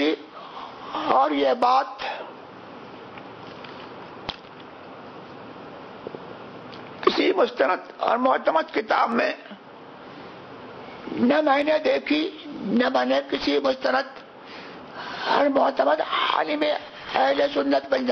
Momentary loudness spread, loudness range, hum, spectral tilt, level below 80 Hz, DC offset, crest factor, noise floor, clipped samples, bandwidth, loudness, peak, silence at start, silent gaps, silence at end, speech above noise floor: 20 LU; 16 LU; none; -5 dB/octave; -64 dBFS; under 0.1%; 22 dB; -43 dBFS; under 0.1%; 6.6 kHz; -23 LUFS; -4 dBFS; 0 s; none; 0 s; 22 dB